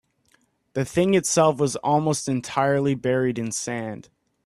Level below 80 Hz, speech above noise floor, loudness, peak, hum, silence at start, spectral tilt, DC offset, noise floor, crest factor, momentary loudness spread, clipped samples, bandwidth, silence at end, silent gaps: -60 dBFS; 42 dB; -23 LUFS; -6 dBFS; none; 0.75 s; -5 dB/octave; under 0.1%; -65 dBFS; 18 dB; 11 LU; under 0.1%; 13.5 kHz; 0.45 s; none